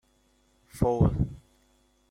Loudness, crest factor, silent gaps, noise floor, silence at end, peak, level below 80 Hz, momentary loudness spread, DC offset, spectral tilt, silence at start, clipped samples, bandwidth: -27 LUFS; 20 dB; none; -67 dBFS; 0.75 s; -10 dBFS; -42 dBFS; 25 LU; under 0.1%; -9.5 dB/octave; 0.75 s; under 0.1%; 15 kHz